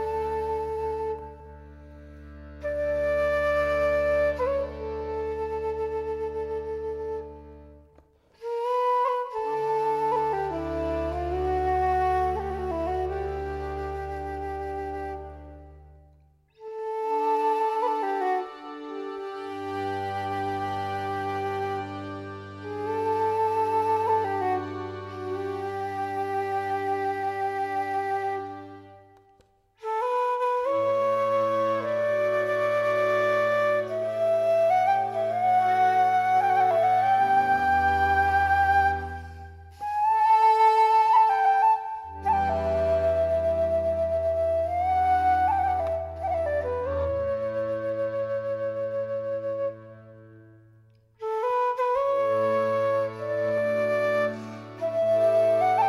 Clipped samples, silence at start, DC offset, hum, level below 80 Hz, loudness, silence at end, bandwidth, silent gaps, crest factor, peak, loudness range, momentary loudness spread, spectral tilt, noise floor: under 0.1%; 0 s; under 0.1%; none; -46 dBFS; -26 LUFS; 0 s; 14.5 kHz; none; 16 dB; -10 dBFS; 9 LU; 13 LU; -6.5 dB/octave; -62 dBFS